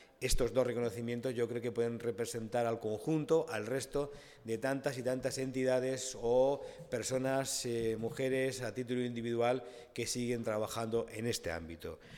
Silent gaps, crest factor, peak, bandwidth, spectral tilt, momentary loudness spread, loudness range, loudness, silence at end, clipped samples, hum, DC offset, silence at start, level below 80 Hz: none; 18 dB; -18 dBFS; 17.5 kHz; -4.5 dB/octave; 7 LU; 2 LU; -36 LUFS; 0 s; under 0.1%; none; under 0.1%; 0 s; -52 dBFS